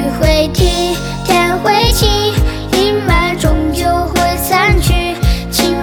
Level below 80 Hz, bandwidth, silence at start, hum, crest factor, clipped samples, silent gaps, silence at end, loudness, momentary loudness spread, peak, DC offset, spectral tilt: -18 dBFS; over 20 kHz; 0 s; none; 12 dB; under 0.1%; none; 0 s; -13 LUFS; 4 LU; 0 dBFS; under 0.1%; -4.5 dB/octave